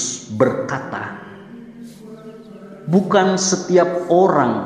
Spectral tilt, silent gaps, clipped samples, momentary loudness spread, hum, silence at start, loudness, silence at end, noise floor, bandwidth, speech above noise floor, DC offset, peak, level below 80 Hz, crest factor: -5 dB/octave; none; under 0.1%; 23 LU; none; 0 s; -17 LUFS; 0 s; -38 dBFS; 10.5 kHz; 21 dB; under 0.1%; -2 dBFS; -62 dBFS; 18 dB